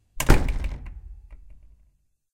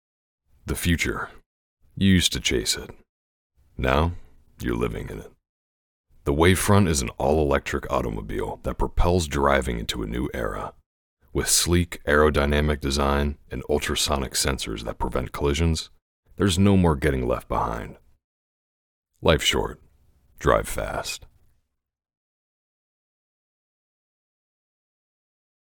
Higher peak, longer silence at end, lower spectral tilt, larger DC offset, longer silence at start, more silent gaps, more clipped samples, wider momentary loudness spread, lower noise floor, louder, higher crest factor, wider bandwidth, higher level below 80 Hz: about the same, 0 dBFS vs -2 dBFS; second, 1 s vs 4.5 s; about the same, -5 dB/octave vs -4.5 dB/octave; neither; second, 0.15 s vs 0.65 s; second, none vs 1.46-1.77 s, 3.09-3.50 s, 5.49-6.04 s, 10.86-11.17 s, 16.02-16.23 s, 18.24-19.03 s; neither; first, 25 LU vs 14 LU; second, -64 dBFS vs -74 dBFS; about the same, -25 LUFS vs -23 LUFS; about the same, 24 dB vs 22 dB; about the same, 16.5 kHz vs 18 kHz; first, -28 dBFS vs -36 dBFS